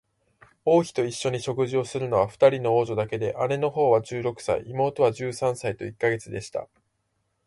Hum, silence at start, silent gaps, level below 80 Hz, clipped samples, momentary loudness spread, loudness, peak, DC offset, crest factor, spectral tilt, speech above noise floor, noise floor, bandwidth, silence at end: none; 0.65 s; none; -60 dBFS; under 0.1%; 10 LU; -25 LUFS; -6 dBFS; under 0.1%; 20 dB; -6 dB/octave; 50 dB; -74 dBFS; 11.5 kHz; 0.8 s